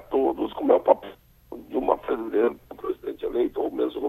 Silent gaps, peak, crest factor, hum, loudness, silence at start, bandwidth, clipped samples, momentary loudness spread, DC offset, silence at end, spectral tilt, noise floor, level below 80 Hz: none; -4 dBFS; 22 dB; none; -25 LUFS; 0 s; 13.5 kHz; under 0.1%; 13 LU; under 0.1%; 0 s; -7.5 dB/octave; -43 dBFS; -54 dBFS